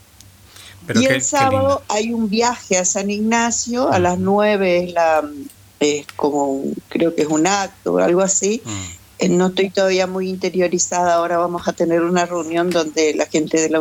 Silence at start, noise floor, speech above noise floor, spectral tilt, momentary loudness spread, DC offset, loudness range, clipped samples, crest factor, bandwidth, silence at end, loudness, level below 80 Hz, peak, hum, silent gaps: 0.55 s; -46 dBFS; 28 dB; -4 dB/octave; 6 LU; under 0.1%; 2 LU; under 0.1%; 16 dB; 17 kHz; 0 s; -17 LUFS; -54 dBFS; -2 dBFS; none; none